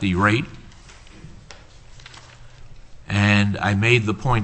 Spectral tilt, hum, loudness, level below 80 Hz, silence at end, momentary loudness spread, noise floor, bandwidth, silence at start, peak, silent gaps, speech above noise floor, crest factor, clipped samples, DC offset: -6 dB/octave; none; -19 LUFS; -40 dBFS; 0 s; 25 LU; -44 dBFS; 8.6 kHz; 0 s; -2 dBFS; none; 24 dB; 22 dB; under 0.1%; under 0.1%